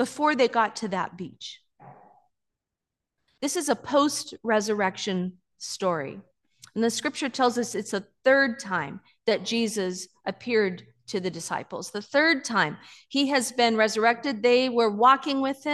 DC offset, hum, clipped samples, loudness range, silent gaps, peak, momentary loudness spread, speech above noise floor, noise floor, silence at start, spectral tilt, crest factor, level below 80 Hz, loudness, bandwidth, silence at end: under 0.1%; none; under 0.1%; 6 LU; none; -6 dBFS; 13 LU; 62 dB; -87 dBFS; 0 s; -3.5 dB/octave; 20 dB; -74 dBFS; -25 LUFS; 12.5 kHz; 0 s